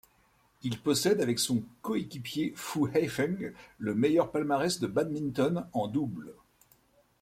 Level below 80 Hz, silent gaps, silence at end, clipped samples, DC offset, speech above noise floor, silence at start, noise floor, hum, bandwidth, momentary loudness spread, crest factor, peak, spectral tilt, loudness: -66 dBFS; none; 0.9 s; under 0.1%; under 0.1%; 37 dB; 0.65 s; -67 dBFS; none; 16.5 kHz; 11 LU; 18 dB; -12 dBFS; -5 dB/octave; -30 LUFS